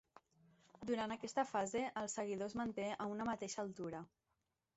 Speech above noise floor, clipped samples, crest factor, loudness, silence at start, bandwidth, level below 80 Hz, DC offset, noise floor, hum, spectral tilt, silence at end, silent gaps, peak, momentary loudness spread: 45 dB; under 0.1%; 20 dB; -43 LUFS; 0.8 s; 8 kHz; -76 dBFS; under 0.1%; -87 dBFS; none; -4 dB/octave; 0.7 s; none; -24 dBFS; 9 LU